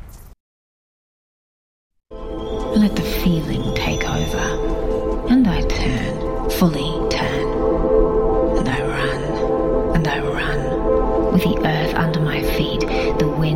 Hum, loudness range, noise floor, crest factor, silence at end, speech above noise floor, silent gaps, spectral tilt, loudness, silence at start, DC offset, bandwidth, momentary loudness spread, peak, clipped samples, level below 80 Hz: none; 3 LU; under -90 dBFS; 16 dB; 0 s; over 72 dB; 0.40-1.90 s; -6 dB/octave; -19 LUFS; 0 s; under 0.1%; 16 kHz; 5 LU; -2 dBFS; under 0.1%; -26 dBFS